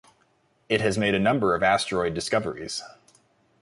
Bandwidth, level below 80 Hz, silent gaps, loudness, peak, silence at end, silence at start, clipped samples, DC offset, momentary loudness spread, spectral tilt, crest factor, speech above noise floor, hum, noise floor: 11.5 kHz; -54 dBFS; none; -24 LUFS; -8 dBFS; 0.75 s; 0.7 s; under 0.1%; under 0.1%; 10 LU; -4.5 dB/octave; 18 dB; 42 dB; none; -66 dBFS